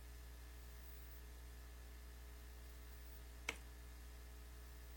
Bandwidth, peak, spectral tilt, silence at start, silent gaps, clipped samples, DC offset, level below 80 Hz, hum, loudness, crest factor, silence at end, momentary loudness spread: 17 kHz; -26 dBFS; -3.5 dB/octave; 0 s; none; under 0.1%; under 0.1%; -56 dBFS; 60 Hz at -55 dBFS; -56 LUFS; 30 dB; 0 s; 9 LU